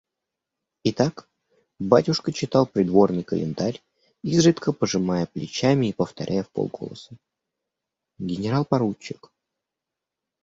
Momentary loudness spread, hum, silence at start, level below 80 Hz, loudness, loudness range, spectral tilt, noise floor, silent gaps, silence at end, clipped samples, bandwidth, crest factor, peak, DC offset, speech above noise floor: 16 LU; none; 0.85 s; -58 dBFS; -23 LUFS; 8 LU; -6 dB/octave; -86 dBFS; none; 1.3 s; under 0.1%; 8 kHz; 22 dB; -2 dBFS; under 0.1%; 63 dB